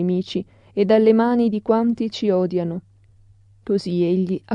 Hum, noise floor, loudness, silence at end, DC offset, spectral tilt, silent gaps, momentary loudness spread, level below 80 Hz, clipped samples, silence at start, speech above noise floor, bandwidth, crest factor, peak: none; -52 dBFS; -20 LUFS; 0 s; under 0.1%; -8 dB/octave; none; 13 LU; -60 dBFS; under 0.1%; 0 s; 33 dB; 9.2 kHz; 16 dB; -4 dBFS